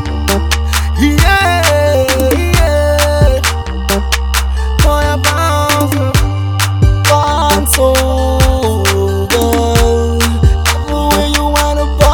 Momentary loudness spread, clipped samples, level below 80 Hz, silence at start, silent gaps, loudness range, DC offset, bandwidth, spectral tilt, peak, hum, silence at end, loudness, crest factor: 5 LU; 0.3%; -16 dBFS; 0 s; none; 2 LU; 0.1%; 20 kHz; -4.5 dB/octave; 0 dBFS; none; 0 s; -11 LUFS; 10 dB